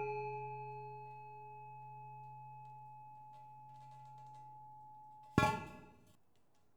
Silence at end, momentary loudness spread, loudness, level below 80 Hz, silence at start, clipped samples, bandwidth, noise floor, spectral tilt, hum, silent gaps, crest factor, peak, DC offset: 0.6 s; 20 LU; -43 LUFS; -66 dBFS; 0 s; under 0.1%; over 20 kHz; -77 dBFS; -6 dB/octave; none; none; 32 dB; -14 dBFS; under 0.1%